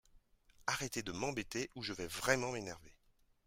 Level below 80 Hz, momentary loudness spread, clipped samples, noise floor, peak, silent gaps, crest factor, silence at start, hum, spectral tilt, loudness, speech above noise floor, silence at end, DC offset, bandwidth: -64 dBFS; 10 LU; under 0.1%; -73 dBFS; -16 dBFS; none; 26 dB; 0.15 s; none; -3 dB/octave; -39 LUFS; 33 dB; 0.55 s; under 0.1%; 16 kHz